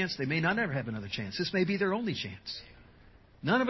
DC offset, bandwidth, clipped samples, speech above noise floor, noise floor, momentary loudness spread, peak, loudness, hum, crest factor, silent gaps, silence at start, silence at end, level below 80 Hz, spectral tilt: under 0.1%; 6.2 kHz; under 0.1%; 26 dB; -57 dBFS; 10 LU; -14 dBFS; -32 LUFS; none; 18 dB; none; 0 s; 0 s; -60 dBFS; -6 dB/octave